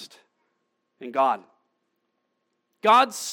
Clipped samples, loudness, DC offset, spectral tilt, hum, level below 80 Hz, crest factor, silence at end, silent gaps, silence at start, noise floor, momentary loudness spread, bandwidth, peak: under 0.1%; -22 LUFS; under 0.1%; -2 dB/octave; none; under -90 dBFS; 20 dB; 0 s; none; 0 s; -76 dBFS; 14 LU; 17.5 kHz; -6 dBFS